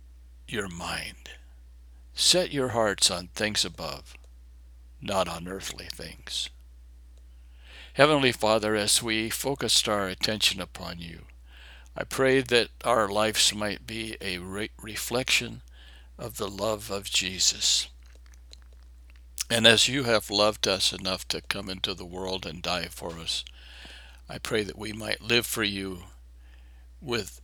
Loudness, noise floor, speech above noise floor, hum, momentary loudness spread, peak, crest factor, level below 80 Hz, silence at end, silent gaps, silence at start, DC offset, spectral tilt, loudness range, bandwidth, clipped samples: -26 LUFS; -49 dBFS; 22 dB; none; 18 LU; 0 dBFS; 28 dB; -50 dBFS; 0 s; none; 0 s; under 0.1%; -2.5 dB/octave; 8 LU; over 20 kHz; under 0.1%